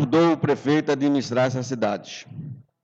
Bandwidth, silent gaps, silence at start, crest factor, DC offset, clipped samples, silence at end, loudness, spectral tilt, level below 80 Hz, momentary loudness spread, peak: 7.8 kHz; none; 0 s; 14 dB; under 0.1%; under 0.1%; 0.2 s; -22 LUFS; -6.5 dB/octave; -64 dBFS; 18 LU; -10 dBFS